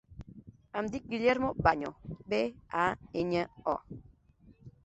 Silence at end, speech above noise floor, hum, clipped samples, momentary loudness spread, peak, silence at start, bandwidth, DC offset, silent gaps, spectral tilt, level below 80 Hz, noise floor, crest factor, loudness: 0.15 s; 29 dB; none; under 0.1%; 22 LU; -10 dBFS; 0.1 s; 8.2 kHz; under 0.1%; none; -6.5 dB/octave; -54 dBFS; -61 dBFS; 24 dB; -32 LUFS